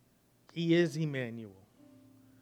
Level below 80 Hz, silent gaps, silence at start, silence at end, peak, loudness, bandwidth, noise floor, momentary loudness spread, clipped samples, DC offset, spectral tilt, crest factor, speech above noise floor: -80 dBFS; none; 0.55 s; 0.9 s; -16 dBFS; -32 LUFS; 12 kHz; -66 dBFS; 19 LU; under 0.1%; under 0.1%; -6.5 dB/octave; 18 dB; 34 dB